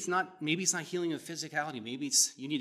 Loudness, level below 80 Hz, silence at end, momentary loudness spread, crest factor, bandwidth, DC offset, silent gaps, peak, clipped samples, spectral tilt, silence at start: -31 LUFS; under -90 dBFS; 0 s; 11 LU; 22 dB; 15 kHz; under 0.1%; none; -12 dBFS; under 0.1%; -2 dB/octave; 0 s